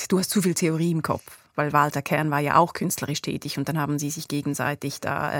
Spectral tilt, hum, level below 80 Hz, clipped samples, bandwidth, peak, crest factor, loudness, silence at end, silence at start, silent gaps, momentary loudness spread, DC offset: -5 dB/octave; none; -60 dBFS; under 0.1%; 18 kHz; -4 dBFS; 20 dB; -25 LUFS; 0 s; 0 s; none; 8 LU; under 0.1%